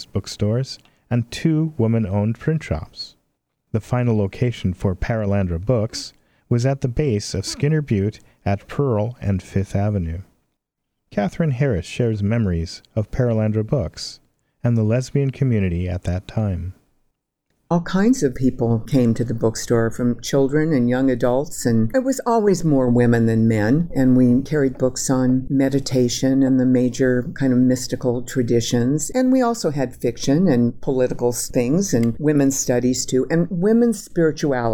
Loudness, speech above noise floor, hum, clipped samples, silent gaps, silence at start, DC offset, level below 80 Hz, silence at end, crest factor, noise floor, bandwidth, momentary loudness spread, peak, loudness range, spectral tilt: -20 LUFS; 58 dB; none; under 0.1%; none; 0 s; under 0.1%; -40 dBFS; 0 s; 14 dB; -77 dBFS; 17 kHz; 8 LU; -4 dBFS; 5 LU; -6.5 dB/octave